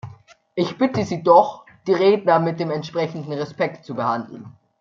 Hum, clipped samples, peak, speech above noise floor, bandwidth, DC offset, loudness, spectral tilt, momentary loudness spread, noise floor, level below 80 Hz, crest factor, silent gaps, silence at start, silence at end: none; under 0.1%; -2 dBFS; 26 dB; 7.4 kHz; under 0.1%; -20 LUFS; -7 dB/octave; 16 LU; -45 dBFS; -66 dBFS; 18 dB; none; 0.05 s; 0.3 s